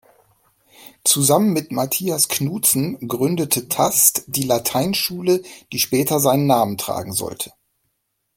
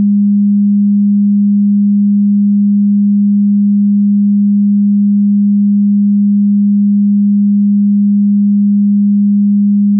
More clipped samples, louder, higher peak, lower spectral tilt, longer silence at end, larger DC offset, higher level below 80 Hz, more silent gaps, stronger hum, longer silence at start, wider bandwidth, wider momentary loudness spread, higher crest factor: neither; second, -18 LUFS vs -10 LUFS; first, 0 dBFS vs -6 dBFS; second, -3.5 dB/octave vs -27.5 dB/octave; first, 0.9 s vs 0 s; neither; first, -58 dBFS vs -90 dBFS; neither; neither; first, 0.8 s vs 0 s; first, 17 kHz vs 0.3 kHz; first, 10 LU vs 0 LU; first, 20 dB vs 4 dB